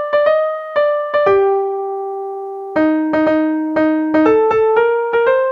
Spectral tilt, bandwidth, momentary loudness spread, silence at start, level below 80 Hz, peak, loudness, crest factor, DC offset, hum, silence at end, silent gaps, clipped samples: -7 dB/octave; 5.4 kHz; 10 LU; 0 s; -54 dBFS; 0 dBFS; -15 LUFS; 14 dB; under 0.1%; none; 0 s; none; under 0.1%